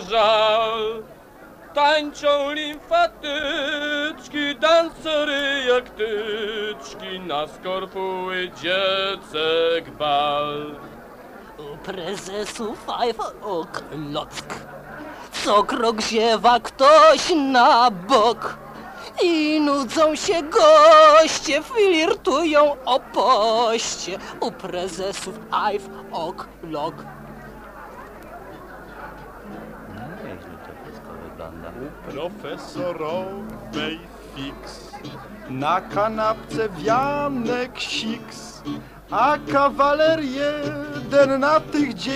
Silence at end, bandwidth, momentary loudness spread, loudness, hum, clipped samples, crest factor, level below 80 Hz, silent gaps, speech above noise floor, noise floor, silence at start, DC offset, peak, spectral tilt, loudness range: 0 s; 15.5 kHz; 21 LU; -20 LUFS; none; under 0.1%; 18 dB; -50 dBFS; none; 24 dB; -44 dBFS; 0 s; under 0.1%; -4 dBFS; -3.5 dB/octave; 18 LU